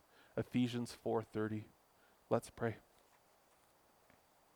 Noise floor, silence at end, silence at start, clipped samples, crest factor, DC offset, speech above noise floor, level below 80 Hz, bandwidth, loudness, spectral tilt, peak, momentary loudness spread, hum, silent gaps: -71 dBFS; 1.75 s; 0.35 s; under 0.1%; 24 dB; under 0.1%; 31 dB; -74 dBFS; over 20 kHz; -41 LUFS; -6.5 dB/octave; -20 dBFS; 10 LU; none; none